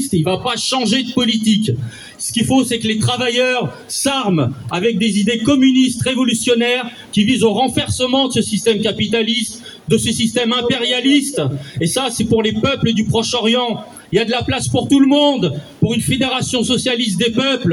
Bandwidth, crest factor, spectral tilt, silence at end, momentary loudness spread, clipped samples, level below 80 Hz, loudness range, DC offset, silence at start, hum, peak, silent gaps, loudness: 13.5 kHz; 14 dB; -4.5 dB/octave; 0 s; 7 LU; under 0.1%; -48 dBFS; 2 LU; under 0.1%; 0 s; none; -2 dBFS; none; -16 LUFS